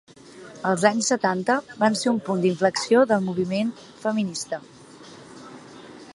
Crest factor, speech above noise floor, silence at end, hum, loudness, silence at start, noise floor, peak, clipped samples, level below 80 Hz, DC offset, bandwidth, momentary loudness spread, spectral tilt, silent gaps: 22 dB; 23 dB; 0.05 s; none; -23 LUFS; 0.35 s; -45 dBFS; -2 dBFS; under 0.1%; -68 dBFS; under 0.1%; 11.5 kHz; 23 LU; -4.5 dB/octave; none